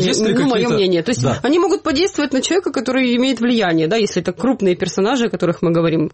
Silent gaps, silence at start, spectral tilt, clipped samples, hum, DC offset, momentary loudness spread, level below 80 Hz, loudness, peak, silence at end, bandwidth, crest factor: none; 0 s; -5 dB/octave; under 0.1%; none; under 0.1%; 3 LU; -50 dBFS; -16 LUFS; -6 dBFS; 0.05 s; 8.8 kHz; 10 dB